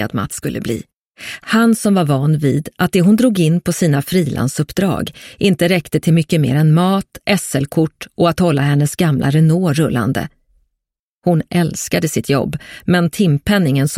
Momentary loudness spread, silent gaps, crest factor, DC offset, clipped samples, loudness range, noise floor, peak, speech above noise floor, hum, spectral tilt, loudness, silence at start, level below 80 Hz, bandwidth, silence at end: 9 LU; 0.93-1.11 s, 10.99-11.22 s; 14 dB; under 0.1%; under 0.1%; 3 LU; -79 dBFS; 0 dBFS; 64 dB; none; -6 dB/octave; -15 LUFS; 0 s; -44 dBFS; 16 kHz; 0 s